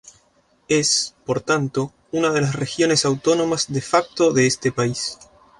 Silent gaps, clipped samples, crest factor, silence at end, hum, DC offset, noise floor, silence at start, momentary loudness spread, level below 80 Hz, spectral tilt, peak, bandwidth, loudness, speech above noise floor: none; under 0.1%; 18 dB; 0.35 s; none; under 0.1%; -60 dBFS; 0.05 s; 8 LU; -56 dBFS; -4 dB/octave; -2 dBFS; 11.5 kHz; -20 LUFS; 40 dB